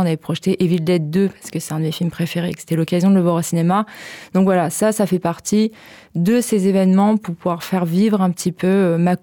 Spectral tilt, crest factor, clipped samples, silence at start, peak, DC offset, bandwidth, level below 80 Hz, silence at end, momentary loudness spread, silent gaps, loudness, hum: -6.5 dB/octave; 10 dB; under 0.1%; 0 s; -6 dBFS; under 0.1%; 18 kHz; -58 dBFS; 0.05 s; 8 LU; none; -18 LUFS; none